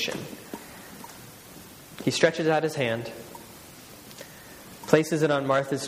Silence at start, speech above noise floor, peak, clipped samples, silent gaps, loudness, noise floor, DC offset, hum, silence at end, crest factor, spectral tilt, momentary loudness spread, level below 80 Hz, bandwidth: 0 s; 22 dB; -2 dBFS; under 0.1%; none; -25 LUFS; -47 dBFS; under 0.1%; none; 0 s; 26 dB; -4.5 dB/octave; 22 LU; -64 dBFS; 15.5 kHz